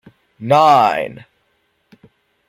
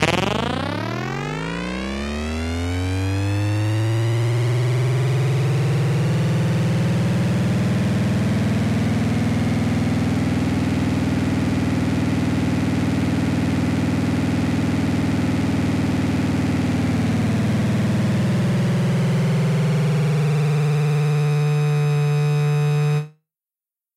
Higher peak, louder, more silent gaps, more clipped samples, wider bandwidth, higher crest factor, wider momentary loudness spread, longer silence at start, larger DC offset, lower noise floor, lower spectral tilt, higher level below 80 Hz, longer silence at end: about the same, -2 dBFS vs 0 dBFS; first, -13 LUFS vs -20 LUFS; neither; neither; first, 15 kHz vs 13.5 kHz; about the same, 16 dB vs 20 dB; first, 18 LU vs 4 LU; first, 0.4 s vs 0 s; neither; second, -64 dBFS vs under -90 dBFS; second, -5.5 dB/octave vs -7 dB/octave; second, -62 dBFS vs -42 dBFS; first, 1.3 s vs 0.9 s